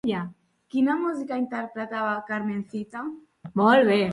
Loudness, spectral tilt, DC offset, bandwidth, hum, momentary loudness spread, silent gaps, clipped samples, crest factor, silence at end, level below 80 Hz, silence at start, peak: -25 LUFS; -7 dB/octave; under 0.1%; 11.5 kHz; none; 16 LU; none; under 0.1%; 20 dB; 0 s; -68 dBFS; 0.05 s; -6 dBFS